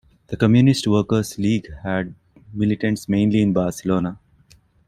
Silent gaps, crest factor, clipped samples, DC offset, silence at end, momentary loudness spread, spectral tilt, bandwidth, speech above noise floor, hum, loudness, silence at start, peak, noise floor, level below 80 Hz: none; 18 dB; under 0.1%; under 0.1%; 0.75 s; 11 LU; -6.5 dB/octave; 14 kHz; 36 dB; none; -20 LUFS; 0.3 s; -2 dBFS; -54 dBFS; -48 dBFS